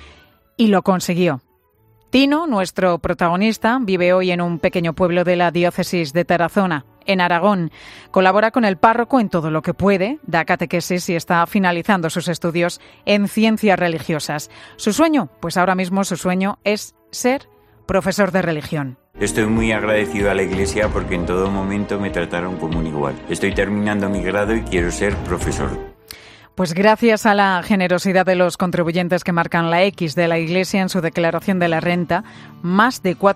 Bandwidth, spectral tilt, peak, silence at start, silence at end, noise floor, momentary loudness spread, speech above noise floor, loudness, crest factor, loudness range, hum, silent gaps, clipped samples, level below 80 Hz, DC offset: 15.5 kHz; -5.5 dB/octave; 0 dBFS; 0 s; 0 s; -57 dBFS; 8 LU; 39 dB; -18 LUFS; 18 dB; 4 LU; none; none; under 0.1%; -40 dBFS; under 0.1%